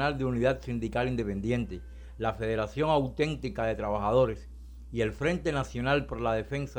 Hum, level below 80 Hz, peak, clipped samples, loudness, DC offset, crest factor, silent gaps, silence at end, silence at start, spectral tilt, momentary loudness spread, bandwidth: none; -44 dBFS; -14 dBFS; under 0.1%; -30 LUFS; under 0.1%; 16 dB; none; 0 s; 0 s; -7 dB/octave; 10 LU; 19 kHz